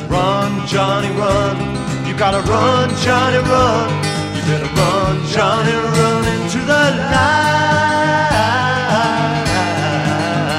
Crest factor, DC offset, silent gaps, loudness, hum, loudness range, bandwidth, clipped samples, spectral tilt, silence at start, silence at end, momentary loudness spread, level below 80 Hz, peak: 14 dB; under 0.1%; none; -15 LUFS; none; 2 LU; 14.5 kHz; under 0.1%; -5 dB/octave; 0 s; 0 s; 5 LU; -36 dBFS; 0 dBFS